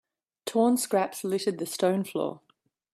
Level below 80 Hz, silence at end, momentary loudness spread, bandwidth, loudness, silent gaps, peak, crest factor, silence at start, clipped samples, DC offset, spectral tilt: -76 dBFS; 0.55 s; 8 LU; 16 kHz; -27 LUFS; none; -12 dBFS; 16 dB; 0.45 s; under 0.1%; under 0.1%; -4.5 dB/octave